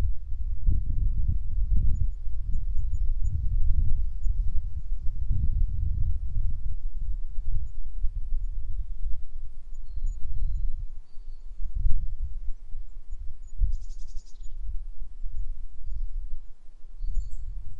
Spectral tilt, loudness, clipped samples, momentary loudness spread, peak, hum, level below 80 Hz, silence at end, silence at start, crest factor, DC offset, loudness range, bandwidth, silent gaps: -8.5 dB/octave; -34 LUFS; under 0.1%; 15 LU; -6 dBFS; none; -28 dBFS; 0 s; 0 s; 16 dB; under 0.1%; 9 LU; 0.4 kHz; none